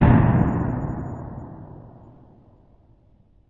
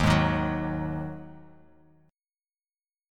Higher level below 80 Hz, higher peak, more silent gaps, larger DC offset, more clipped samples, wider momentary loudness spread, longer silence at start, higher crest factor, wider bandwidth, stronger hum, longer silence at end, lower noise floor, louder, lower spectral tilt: first, -34 dBFS vs -42 dBFS; first, -2 dBFS vs -8 dBFS; neither; neither; neither; first, 25 LU vs 19 LU; about the same, 0 s vs 0 s; about the same, 20 dB vs 22 dB; second, 3.8 kHz vs 13 kHz; neither; about the same, 1.65 s vs 1.7 s; second, -56 dBFS vs under -90 dBFS; first, -22 LUFS vs -28 LUFS; first, -11 dB/octave vs -6.5 dB/octave